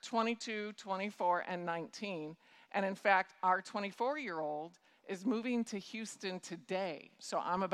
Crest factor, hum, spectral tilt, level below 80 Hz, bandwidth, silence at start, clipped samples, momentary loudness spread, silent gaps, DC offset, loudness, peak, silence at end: 22 dB; none; -4.5 dB/octave; -84 dBFS; 13.5 kHz; 0.05 s; under 0.1%; 12 LU; none; under 0.1%; -38 LUFS; -14 dBFS; 0 s